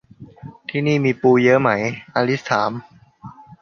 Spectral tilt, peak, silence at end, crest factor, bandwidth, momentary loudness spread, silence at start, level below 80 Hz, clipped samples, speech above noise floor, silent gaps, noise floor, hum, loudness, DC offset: -6.5 dB/octave; -2 dBFS; 0.3 s; 18 dB; 7 kHz; 20 LU; 0.2 s; -60 dBFS; under 0.1%; 24 dB; none; -41 dBFS; none; -18 LUFS; under 0.1%